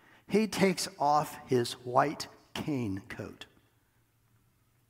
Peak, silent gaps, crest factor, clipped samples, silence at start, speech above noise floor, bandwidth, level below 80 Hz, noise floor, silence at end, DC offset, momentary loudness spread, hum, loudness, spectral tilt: -10 dBFS; none; 22 dB; under 0.1%; 0.3 s; 40 dB; 16 kHz; -70 dBFS; -70 dBFS; 1.45 s; under 0.1%; 15 LU; none; -31 LUFS; -5 dB/octave